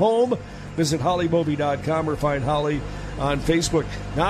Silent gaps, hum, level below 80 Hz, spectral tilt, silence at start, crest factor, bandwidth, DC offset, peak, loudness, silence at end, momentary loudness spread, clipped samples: none; none; -38 dBFS; -5.5 dB/octave; 0 s; 16 dB; 14 kHz; under 0.1%; -6 dBFS; -23 LUFS; 0 s; 8 LU; under 0.1%